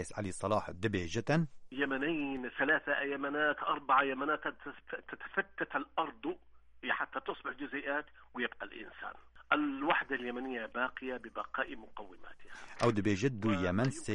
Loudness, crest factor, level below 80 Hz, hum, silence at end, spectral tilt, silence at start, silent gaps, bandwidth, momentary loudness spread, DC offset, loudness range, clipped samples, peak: -35 LUFS; 22 dB; -64 dBFS; none; 0 s; -5.5 dB/octave; 0 s; none; 11 kHz; 15 LU; under 0.1%; 6 LU; under 0.1%; -14 dBFS